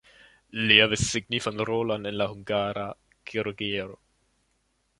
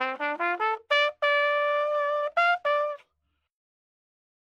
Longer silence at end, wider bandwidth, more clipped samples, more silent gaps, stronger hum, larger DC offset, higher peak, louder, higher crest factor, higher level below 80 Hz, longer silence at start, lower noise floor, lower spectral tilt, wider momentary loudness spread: second, 1.05 s vs 1.55 s; first, 11.5 kHz vs 8.2 kHz; neither; neither; neither; neither; first, -2 dBFS vs -10 dBFS; about the same, -25 LUFS vs -25 LUFS; first, 26 dB vs 16 dB; first, -54 dBFS vs -82 dBFS; first, 0.55 s vs 0 s; second, -72 dBFS vs -77 dBFS; first, -3.5 dB/octave vs -1 dB/octave; first, 18 LU vs 5 LU